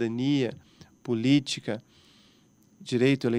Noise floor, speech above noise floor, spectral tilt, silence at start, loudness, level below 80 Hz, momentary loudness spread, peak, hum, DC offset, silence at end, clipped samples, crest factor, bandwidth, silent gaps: -61 dBFS; 35 dB; -6 dB/octave; 0 s; -27 LUFS; -70 dBFS; 14 LU; -10 dBFS; none; under 0.1%; 0 s; under 0.1%; 18 dB; 11 kHz; none